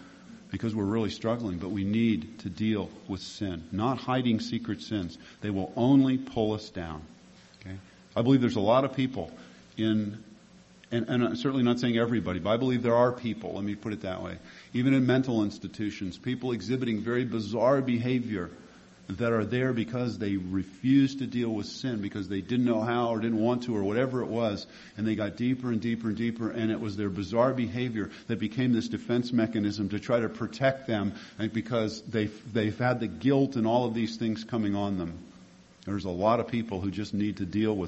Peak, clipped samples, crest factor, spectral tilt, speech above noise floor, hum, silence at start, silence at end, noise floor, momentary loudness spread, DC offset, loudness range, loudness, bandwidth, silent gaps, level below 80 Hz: -10 dBFS; under 0.1%; 20 dB; -7 dB/octave; 27 dB; none; 0 s; 0 s; -55 dBFS; 11 LU; under 0.1%; 3 LU; -29 LUFS; 8.2 kHz; none; -56 dBFS